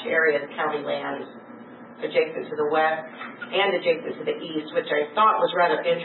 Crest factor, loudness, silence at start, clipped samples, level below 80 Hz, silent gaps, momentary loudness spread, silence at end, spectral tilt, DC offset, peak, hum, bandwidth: 18 dB; -24 LUFS; 0 s; under 0.1%; -86 dBFS; none; 17 LU; 0 s; -8.5 dB/octave; under 0.1%; -6 dBFS; none; 4.3 kHz